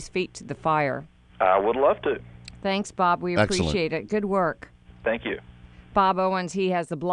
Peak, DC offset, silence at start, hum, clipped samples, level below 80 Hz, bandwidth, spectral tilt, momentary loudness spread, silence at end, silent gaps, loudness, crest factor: -6 dBFS; under 0.1%; 0 s; none; under 0.1%; -48 dBFS; 11 kHz; -5.5 dB/octave; 11 LU; 0 s; none; -25 LUFS; 20 dB